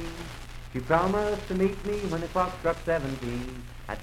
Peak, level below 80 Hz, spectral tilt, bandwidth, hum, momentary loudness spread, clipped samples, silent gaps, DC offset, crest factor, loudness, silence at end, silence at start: -8 dBFS; -42 dBFS; -6 dB/octave; 16 kHz; none; 15 LU; under 0.1%; none; under 0.1%; 20 dB; -29 LUFS; 0 s; 0 s